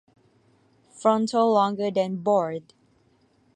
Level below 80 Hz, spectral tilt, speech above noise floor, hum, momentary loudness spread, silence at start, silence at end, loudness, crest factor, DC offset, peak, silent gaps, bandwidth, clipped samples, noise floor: -74 dBFS; -6 dB/octave; 40 dB; none; 6 LU; 0.95 s; 0.95 s; -23 LUFS; 20 dB; under 0.1%; -6 dBFS; none; 10 kHz; under 0.1%; -63 dBFS